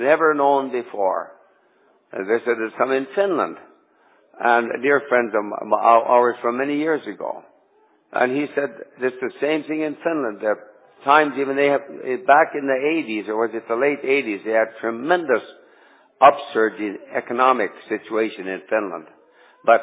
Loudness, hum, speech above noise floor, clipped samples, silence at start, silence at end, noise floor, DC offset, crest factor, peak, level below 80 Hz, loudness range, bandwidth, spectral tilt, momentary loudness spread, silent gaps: -20 LUFS; none; 39 dB; under 0.1%; 0 s; 0 s; -59 dBFS; under 0.1%; 20 dB; 0 dBFS; -74 dBFS; 5 LU; 4 kHz; -8.5 dB/octave; 13 LU; none